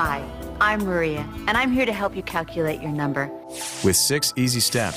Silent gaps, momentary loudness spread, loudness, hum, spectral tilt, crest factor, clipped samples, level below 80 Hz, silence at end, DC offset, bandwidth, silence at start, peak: none; 10 LU; -22 LUFS; none; -3.5 dB/octave; 16 dB; under 0.1%; -42 dBFS; 0 s; under 0.1%; 16 kHz; 0 s; -6 dBFS